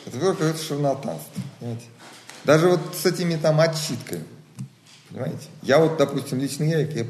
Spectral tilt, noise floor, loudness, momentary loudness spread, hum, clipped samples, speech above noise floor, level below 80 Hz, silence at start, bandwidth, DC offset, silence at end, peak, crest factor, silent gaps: -5.5 dB/octave; -43 dBFS; -23 LUFS; 22 LU; none; under 0.1%; 21 dB; -66 dBFS; 0 s; 13 kHz; under 0.1%; 0 s; -2 dBFS; 20 dB; none